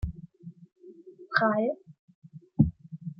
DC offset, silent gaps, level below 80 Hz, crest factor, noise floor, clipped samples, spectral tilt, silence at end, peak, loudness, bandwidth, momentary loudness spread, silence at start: under 0.1%; 1.99-2.08 s, 2.15-2.22 s; -48 dBFS; 26 dB; -50 dBFS; under 0.1%; -9.5 dB/octave; 0.05 s; -6 dBFS; -28 LUFS; 5.8 kHz; 24 LU; 0 s